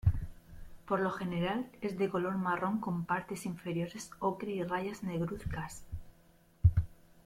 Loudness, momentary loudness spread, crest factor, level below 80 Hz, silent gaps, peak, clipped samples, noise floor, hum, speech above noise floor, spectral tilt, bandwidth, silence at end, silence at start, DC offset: -35 LUFS; 12 LU; 22 dB; -46 dBFS; none; -14 dBFS; under 0.1%; -64 dBFS; none; 28 dB; -7 dB/octave; 15.5 kHz; 0.05 s; 0.05 s; under 0.1%